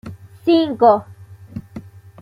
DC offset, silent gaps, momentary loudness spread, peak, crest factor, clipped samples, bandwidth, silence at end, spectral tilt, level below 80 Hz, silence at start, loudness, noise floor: under 0.1%; none; 24 LU; -2 dBFS; 18 dB; under 0.1%; 5.4 kHz; 0.4 s; -8 dB/octave; -54 dBFS; 0.05 s; -16 LUFS; -37 dBFS